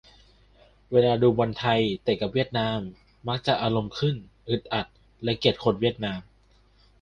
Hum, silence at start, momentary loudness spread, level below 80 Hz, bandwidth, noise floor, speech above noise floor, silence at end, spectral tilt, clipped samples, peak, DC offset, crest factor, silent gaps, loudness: none; 0.9 s; 11 LU; -54 dBFS; 9.2 kHz; -60 dBFS; 35 dB; 0.8 s; -7 dB/octave; under 0.1%; -6 dBFS; under 0.1%; 20 dB; none; -26 LUFS